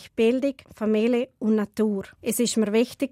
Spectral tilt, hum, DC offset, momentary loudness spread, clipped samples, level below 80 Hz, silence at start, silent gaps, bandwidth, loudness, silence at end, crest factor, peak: -5 dB/octave; none; under 0.1%; 7 LU; under 0.1%; -64 dBFS; 0 s; none; 16 kHz; -24 LUFS; 0.05 s; 12 dB; -12 dBFS